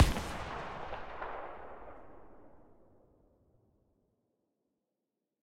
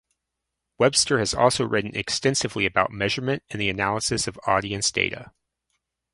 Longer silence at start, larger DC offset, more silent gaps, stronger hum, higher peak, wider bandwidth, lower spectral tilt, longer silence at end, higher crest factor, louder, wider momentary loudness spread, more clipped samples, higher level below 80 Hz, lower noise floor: second, 0 s vs 0.8 s; neither; neither; neither; second, -12 dBFS vs -2 dBFS; first, 16 kHz vs 11.5 kHz; first, -5 dB/octave vs -3 dB/octave; second, 0 s vs 0.85 s; first, 28 dB vs 22 dB; second, -40 LUFS vs -23 LUFS; first, 20 LU vs 6 LU; neither; about the same, -46 dBFS vs -50 dBFS; first, -88 dBFS vs -83 dBFS